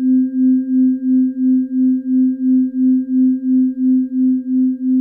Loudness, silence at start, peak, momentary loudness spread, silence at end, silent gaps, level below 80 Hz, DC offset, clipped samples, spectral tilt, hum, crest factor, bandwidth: -15 LUFS; 0 s; -8 dBFS; 2 LU; 0 s; none; -70 dBFS; under 0.1%; under 0.1%; -12.5 dB/octave; none; 6 dB; 1.7 kHz